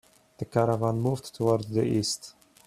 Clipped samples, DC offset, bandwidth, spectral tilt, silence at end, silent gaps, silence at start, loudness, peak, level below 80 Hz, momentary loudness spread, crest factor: under 0.1%; under 0.1%; 14.5 kHz; -6 dB/octave; 0.35 s; none; 0.4 s; -27 LUFS; -8 dBFS; -60 dBFS; 9 LU; 20 dB